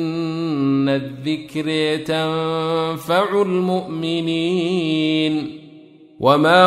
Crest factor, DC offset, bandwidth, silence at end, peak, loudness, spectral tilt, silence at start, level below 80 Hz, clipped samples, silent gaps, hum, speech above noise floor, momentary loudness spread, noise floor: 18 dB; under 0.1%; 14.5 kHz; 0 s; -2 dBFS; -20 LUFS; -6 dB/octave; 0 s; -60 dBFS; under 0.1%; none; none; 26 dB; 7 LU; -44 dBFS